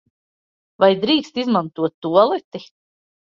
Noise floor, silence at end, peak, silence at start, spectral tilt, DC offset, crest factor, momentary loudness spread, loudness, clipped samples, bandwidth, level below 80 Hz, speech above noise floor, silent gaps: under -90 dBFS; 0.6 s; -2 dBFS; 0.8 s; -6.5 dB/octave; under 0.1%; 18 dB; 10 LU; -18 LUFS; under 0.1%; 7.4 kHz; -66 dBFS; over 72 dB; 1.94-2.02 s, 2.44-2.51 s